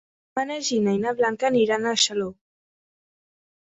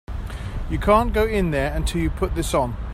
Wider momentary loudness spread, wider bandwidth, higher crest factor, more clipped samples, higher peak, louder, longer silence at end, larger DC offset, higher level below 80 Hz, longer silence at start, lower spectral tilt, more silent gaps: second, 9 LU vs 14 LU; second, 8.4 kHz vs 16 kHz; about the same, 20 dB vs 18 dB; neither; about the same, -6 dBFS vs -4 dBFS; about the same, -23 LUFS vs -22 LUFS; first, 1.45 s vs 0 s; neither; second, -66 dBFS vs -28 dBFS; first, 0.35 s vs 0.1 s; second, -3 dB/octave vs -6 dB/octave; neither